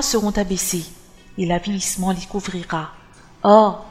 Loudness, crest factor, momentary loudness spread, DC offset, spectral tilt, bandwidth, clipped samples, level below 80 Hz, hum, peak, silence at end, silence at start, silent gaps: -20 LUFS; 20 dB; 14 LU; under 0.1%; -4.5 dB/octave; 16 kHz; under 0.1%; -40 dBFS; none; 0 dBFS; 0 s; 0 s; none